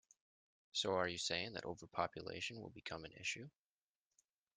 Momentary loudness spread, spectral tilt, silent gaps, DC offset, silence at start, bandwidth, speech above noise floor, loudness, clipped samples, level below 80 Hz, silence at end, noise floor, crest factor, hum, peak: 11 LU; -3 dB/octave; none; under 0.1%; 0.75 s; 10.5 kHz; over 46 dB; -43 LUFS; under 0.1%; -78 dBFS; 1.05 s; under -90 dBFS; 24 dB; none; -22 dBFS